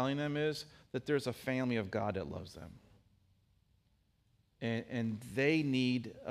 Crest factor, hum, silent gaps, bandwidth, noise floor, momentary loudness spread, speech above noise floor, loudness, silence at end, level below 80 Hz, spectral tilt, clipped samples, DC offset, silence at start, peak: 20 dB; none; none; 15.5 kHz; -74 dBFS; 13 LU; 38 dB; -36 LUFS; 0 s; -70 dBFS; -6.5 dB/octave; under 0.1%; under 0.1%; 0 s; -18 dBFS